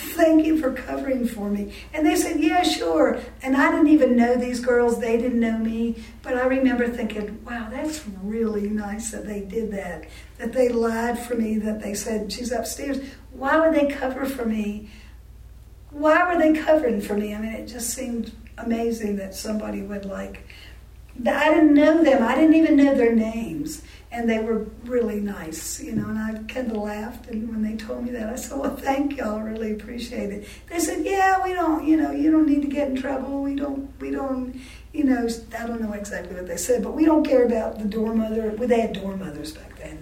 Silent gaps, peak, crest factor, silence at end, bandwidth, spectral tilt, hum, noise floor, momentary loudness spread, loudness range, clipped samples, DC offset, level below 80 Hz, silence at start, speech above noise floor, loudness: none; -4 dBFS; 18 dB; 0 s; 16.5 kHz; -5 dB/octave; none; -44 dBFS; 14 LU; 9 LU; under 0.1%; under 0.1%; -44 dBFS; 0 s; 22 dB; -23 LUFS